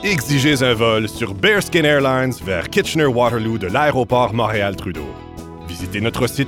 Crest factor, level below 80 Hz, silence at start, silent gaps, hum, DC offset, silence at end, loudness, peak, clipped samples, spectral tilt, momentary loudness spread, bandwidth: 16 dB; -40 dBFS; 0 s; none; none; under 0.1%; 0 s; -17 LUFS; -2 dBFS; under 0.1%; -5 dB/octave; 15 LU; 18.5 kHz